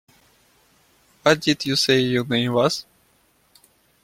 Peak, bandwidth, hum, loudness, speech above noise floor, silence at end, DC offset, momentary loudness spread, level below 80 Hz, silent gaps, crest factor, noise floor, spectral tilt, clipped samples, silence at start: -2 dBFS; 16.5 kHz; none; -20 LUFS; 42 dB; 1.2 s; under 0.1%; 5 LU; -58 dBFS; none; 22 dB; -61 dBFS; -4.5 dB/octave; under 0.1%; 1.25 s